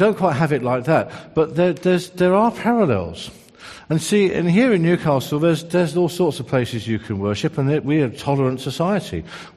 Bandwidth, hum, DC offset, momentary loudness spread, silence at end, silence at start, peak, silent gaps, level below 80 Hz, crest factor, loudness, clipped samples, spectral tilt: 13 kHz; none; under 0.1%; 8 LU; 0.05 s; 0 s; -2 dBFS; none; -52 dBFS; 16 dB; -19 LUFS; under 0.1%; -6.5 dB/octave